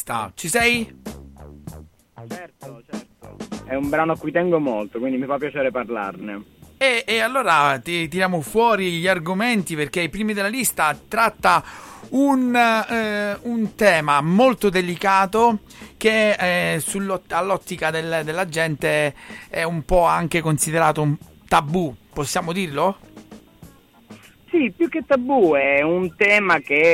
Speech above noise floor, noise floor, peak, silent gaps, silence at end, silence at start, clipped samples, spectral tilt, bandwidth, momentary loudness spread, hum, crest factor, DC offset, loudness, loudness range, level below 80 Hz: 27 dB; -47 dBFS; -4 dBFS; none; 0 s; 0 s; under 0.1%; -4.5 dB/octave; 16.5 kHz; 17 LU; none; 16 dB; under 0.1%; -20 LUFS; 7 LU; -46 dBFS